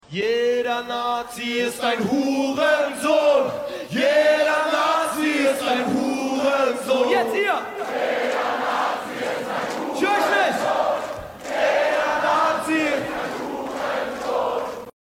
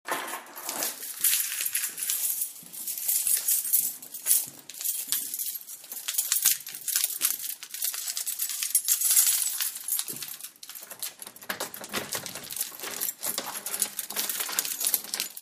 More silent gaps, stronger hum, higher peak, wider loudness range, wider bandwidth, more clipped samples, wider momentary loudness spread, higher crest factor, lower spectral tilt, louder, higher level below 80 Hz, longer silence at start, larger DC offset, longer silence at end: neither; neither; second, -8 dBFS vs -2 dBFS; second, 3 LU vs 8 LU; about the same, 16.5 kHz vs 15.5 kHz; neither; second, 8 LU vs 13 LU; second, 14 dB vs 28 dB; first, -3.5 dB/octave vs 1.5 dB/octave; first, -21 LUFS vs -27 LUFS; first, -60 dBFS vs -80 dBFS; about the same, 0.1 s vs 0.05 s; neither; first, 0.15 s vs 0 s